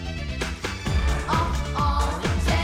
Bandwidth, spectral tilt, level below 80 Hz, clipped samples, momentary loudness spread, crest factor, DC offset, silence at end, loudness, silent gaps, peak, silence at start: 15 kHz; -5 dB/octave; -28 dBFS; under 0.1%; 6 LU; 14 dB; under 0.1%; 0 s; -25 LUFS; none; -10 dBFS; 0 s